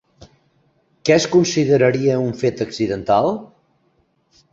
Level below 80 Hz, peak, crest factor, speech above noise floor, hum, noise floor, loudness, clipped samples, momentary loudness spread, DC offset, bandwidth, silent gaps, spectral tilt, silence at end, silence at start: -54 dBFS; -2 dBFS; 18 dB; 46 dB; none; -63 dBFS; -17 LUFS; under 0.1%; 8 LU; under 0.1%; 7.8 kHz; none; -5.5 dB/octave; 1.05 s; 1.05 s